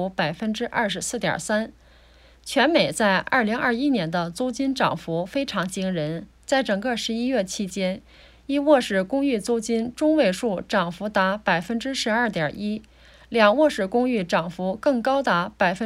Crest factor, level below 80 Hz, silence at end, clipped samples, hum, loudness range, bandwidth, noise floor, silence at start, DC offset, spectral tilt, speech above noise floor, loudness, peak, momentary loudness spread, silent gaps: 18 dB; -54 dBFS; 0 s; under 0.1%; none; 3 LU; 15 kHz; -52 dBFS; 0 s; under 0.1%; -4.5 dB/octave; 29 dB; -23 LUFS; -4 dBFS; 8 LU; none